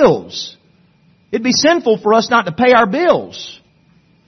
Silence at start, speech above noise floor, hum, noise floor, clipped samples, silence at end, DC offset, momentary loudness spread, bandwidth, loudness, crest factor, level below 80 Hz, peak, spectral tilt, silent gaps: 0 s; 39 dB; none; -52 dBFS; under 0.1%; 0.75 s; under 0.1%; 18 LU; 6.4 kHz; -13 LUFS; 16 dB; -52 dBFS; 0 dBFS; -4 dB/octave; none